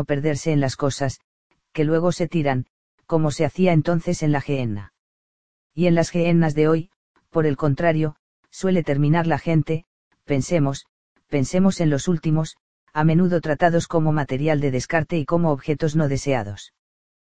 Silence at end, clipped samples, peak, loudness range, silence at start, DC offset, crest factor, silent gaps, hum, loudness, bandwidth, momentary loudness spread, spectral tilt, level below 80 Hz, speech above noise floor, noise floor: 0.55 s; under 0.1%; -2 dBFS; 2 LU; 0 s; 2%; 18 dB; 1.24-1.50 s, 2.70-2.98 s, 4.99-5.70 s, 6.96-7.15 s, 8.19-8.43 s, 9.86-10.11 s, 10.89-11.15 s, 12.60-12.87 s; none; -21 LUFS; 9.4 kHz; 9 LU; -7 dB/octave; -48 dBFS; over 70 dB; under -90 dBFS